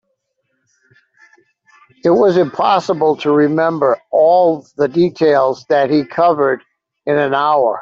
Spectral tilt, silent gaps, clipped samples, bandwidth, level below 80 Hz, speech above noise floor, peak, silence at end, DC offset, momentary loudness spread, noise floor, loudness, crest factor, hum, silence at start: -7 dB/octave; none; under 0.1%; 7.4 kHz; -60 dBFS; 56 dB; -2 dBFS; 0 s; under 0.1%; 6 LU; -69 dBFS; -14 LUFS; 14 dB; none; 2.05 s